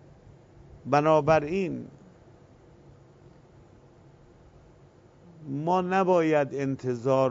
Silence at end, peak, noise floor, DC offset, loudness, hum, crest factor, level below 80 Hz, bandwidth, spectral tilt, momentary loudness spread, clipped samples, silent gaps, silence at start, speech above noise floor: 0 s; -8 dBFS; -55 dBFS; under 0.1%; -25 LUFS; none; 20 dB; -60 dBFS; 7.8 kHz; -7.5 dB/octave; 17 LU; under 0.1%; none; 0.85 s; 31 dB